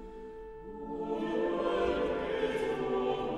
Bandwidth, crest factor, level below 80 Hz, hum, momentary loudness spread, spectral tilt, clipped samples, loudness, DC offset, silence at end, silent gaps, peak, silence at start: 11.5 kHz; 14 dB; -52 dBFS; none; 15 LU; -6 dB/octave; under 0.1%; -33 LUFS; under 0.1%; 0 s; none; -18 dBFS; 0 s